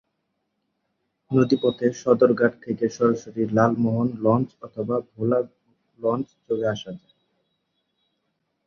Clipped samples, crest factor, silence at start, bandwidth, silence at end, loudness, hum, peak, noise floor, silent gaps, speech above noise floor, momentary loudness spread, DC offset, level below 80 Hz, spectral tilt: under 0.1%; 20 dB; 1.3 s; 7 kHz; 1.7 s; -23 LUFS; none; -4 dBFS; -76 dBFS; none; 54 dB; 11 LU; under 0.1%; -62 dBFS; -7.5 dB/octave